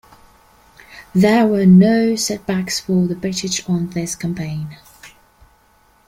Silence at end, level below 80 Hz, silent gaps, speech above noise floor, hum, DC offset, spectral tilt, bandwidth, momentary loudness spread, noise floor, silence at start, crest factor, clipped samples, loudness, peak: 1 s; -50 dBFS; none; 39 dB; none; under 0.1%; -5.5 dB/octave; 15.5 kHz; 13 LU; -55 dBFS; 0.9 s; 16 dB; under 0.1%; -16 LUFS; -2 dBFS